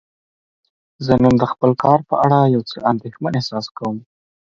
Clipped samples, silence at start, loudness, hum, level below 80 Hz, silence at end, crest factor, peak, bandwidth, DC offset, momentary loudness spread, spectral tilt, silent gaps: under 0.1%; 1 s; -17 LUFS; none; -46 dBFS; 0.5 s; 18 dB; 0 dBFS; 7.4 kHz; under 0.1%; 12 LU; -8 dB/octave; 3.71-3.75 s